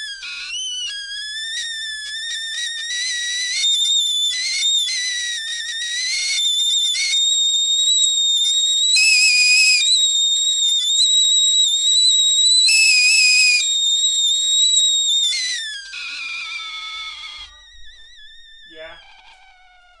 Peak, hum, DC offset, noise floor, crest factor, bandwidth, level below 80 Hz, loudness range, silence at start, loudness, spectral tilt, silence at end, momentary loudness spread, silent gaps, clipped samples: -4 dBFS; none; under 0.1%; -49 dBFS; 16 dB; 11.5 kHz; -58 dBFS; 12 LU; 0 s; -14 LUFS; 6 dB/octave; 1 s; 15 LU; none; under 0.1%